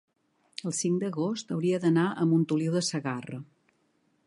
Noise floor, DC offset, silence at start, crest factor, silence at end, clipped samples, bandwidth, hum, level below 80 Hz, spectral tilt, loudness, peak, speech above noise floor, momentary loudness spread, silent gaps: -71 dBFS; under 0.1%; 0.65 s; 16 dB; 0.85 s; under 0.1%; 11.5 kHz; none; -78 dBFS; -5.5 dB/octave; -28 LUFS; -14 dBFS; 43 dB; 13 LU; none